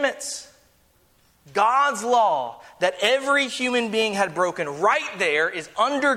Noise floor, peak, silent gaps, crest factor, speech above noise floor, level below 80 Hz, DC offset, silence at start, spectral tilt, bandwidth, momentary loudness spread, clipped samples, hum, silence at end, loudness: -60 dBFS; -6 dBFS; none; 16 dB; 38 dB; -68 dBFS; under 0.1%; 0 s; -2.5 dB/octave; 16 kHz; 8 LU; under 0.1%; none; 0 s; -22 LUFS